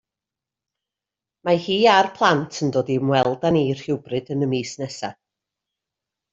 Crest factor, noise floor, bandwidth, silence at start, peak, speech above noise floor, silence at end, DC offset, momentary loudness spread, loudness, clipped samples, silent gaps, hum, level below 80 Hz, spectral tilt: 20 dB; -88 dBFS; 8 kHz; 1.45 s; -2 dBFS; 68 dB; 1.2 s; under 0.1%; 14 LU; -21 LUFS; under 0.1%; none; none; -60 dBFS; -5.5 dB/octave